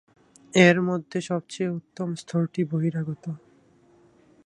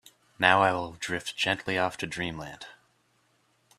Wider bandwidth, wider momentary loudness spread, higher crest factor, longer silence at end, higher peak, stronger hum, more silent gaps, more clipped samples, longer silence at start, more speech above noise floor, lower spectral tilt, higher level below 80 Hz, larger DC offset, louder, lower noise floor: second, 10.5 kHz vs 14.5 kHz; second, 15 LU vs 19 LU; about the same, 24 dB vs 28 dB; about the same, 1.1 s vs 1.05 s; about the same, -2 dBFS vs -2 dBFS; neither; neither; neither; first, 0.55 s vs 0.4 s; second, 34 dB vs 41 dB; first, -6 dB/octave vs -3.5 dB/octave; about the same, -66 dBFS vs -62 dBFS; neither; about the same, -25 LUFS vs -27 LUFS; second, -58 dBFS vs -69 dBFS